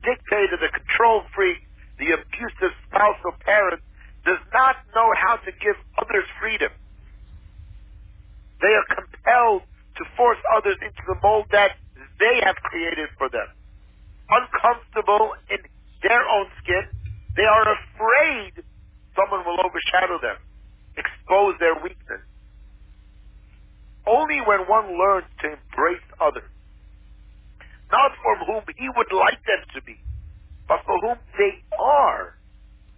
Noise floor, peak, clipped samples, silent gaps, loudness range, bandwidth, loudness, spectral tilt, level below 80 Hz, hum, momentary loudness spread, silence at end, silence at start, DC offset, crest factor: -48 dBFS; -4 dBFS; under 0.1%; none; 4 LU; 4 kHz; -21 LUFS; -7.5 dB/octave; -46 dBFS; none; 13 LU; 0.7 s; 0 s; under 0.1%; 18 dB